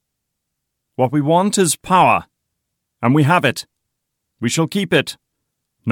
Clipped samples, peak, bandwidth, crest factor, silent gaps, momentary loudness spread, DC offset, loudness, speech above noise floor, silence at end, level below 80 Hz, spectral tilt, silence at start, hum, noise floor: under 0.1%; -2 dBFS; 18 kHz; 16 dB; none; 13 LU; under 0.1%; -16 LUFS; 61 dB; 0 s; -58 dBFS; -4.5 dB/octave; 1 s; none; -77 dBFS